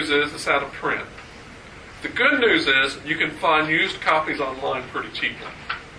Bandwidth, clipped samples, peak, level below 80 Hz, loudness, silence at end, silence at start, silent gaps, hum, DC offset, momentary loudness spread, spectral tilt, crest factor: 11 kHz; under 0.1%; -4 dBFS; -52 dBFS; -21 LUFS; 0 s; 0 s; none; none; under 0.1%; 21 LU; -3.5 dB/octave; 18 dB